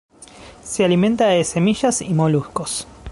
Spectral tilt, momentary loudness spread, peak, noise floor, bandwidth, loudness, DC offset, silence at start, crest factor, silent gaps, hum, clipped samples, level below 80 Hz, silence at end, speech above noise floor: -5 dB/octave; 11 LU; -4 dBFS; -42 dBFS; 11.5 kHz; -18 LUFS; under 0.1%; 0.2 s; 14 dB; none; none; under 0.1%; -46 dBFS; 0 s; 24 dB